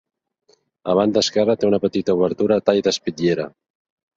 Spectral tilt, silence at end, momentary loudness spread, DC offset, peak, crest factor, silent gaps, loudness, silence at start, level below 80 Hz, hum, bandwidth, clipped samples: -5 dB/octave; 0.7 s; 5 LU; under 0.1%; -2 dBFS; 18 dB; none; -19 LUFS; 0.85 s; -56 dBFS; none; 7.8 kHz; under 0.1%